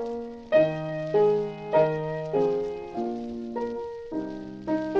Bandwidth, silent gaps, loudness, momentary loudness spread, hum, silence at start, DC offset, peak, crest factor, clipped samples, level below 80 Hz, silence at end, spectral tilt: 7.2 kHz; none; -27 LUFS; 11 LU; none; 0 s; under 0.1%; -10 dBFS; 18 dB; under 0.1%; -58 dBFS; 0 s; -8 dB/octave